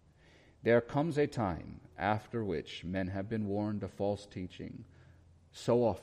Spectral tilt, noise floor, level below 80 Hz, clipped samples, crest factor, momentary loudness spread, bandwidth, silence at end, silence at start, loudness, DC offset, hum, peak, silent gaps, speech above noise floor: -7 dB/octave; -62 dBFS; -60 dBFS; under 0.1%; 20 dB; 15 LU; 11.5 kHz; 0 s; 0.65 s; -35 LUFS; under 0.1%; none; -16 dBFS; none; 28 dB